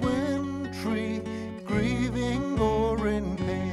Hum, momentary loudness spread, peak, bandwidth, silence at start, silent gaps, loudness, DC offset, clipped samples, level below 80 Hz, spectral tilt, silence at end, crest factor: none; 7 LU; -14 dBFS; 12.5 kHz; 0 s; none; -28 LUFS; under 0.1%; under 0.1%; -42 dBFS; -7 dB/octave; 0 s; 14 dB